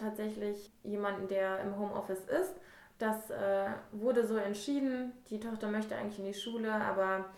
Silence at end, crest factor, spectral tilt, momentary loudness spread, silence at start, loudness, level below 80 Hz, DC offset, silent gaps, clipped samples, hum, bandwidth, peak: 0 s; 16 dB; -5.5 dB/octave; 8 LU; 0 s; -36 LUFS; -70 dBFS; under 0.1%; none; under 0.1%; none; 17.5 kHz; -20 dBFS